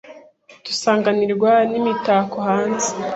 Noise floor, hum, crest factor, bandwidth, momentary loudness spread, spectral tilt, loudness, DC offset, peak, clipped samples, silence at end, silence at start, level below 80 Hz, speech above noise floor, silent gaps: -46 dBFS; none; 16 dB; 8.2 kHz; 6 LU; -4 dB/octave; -18 LUFS; under 0.1%; -2 dBFS; under 0.1%; 0 s; 0.05 s; -64 dBFS; 28 dB; none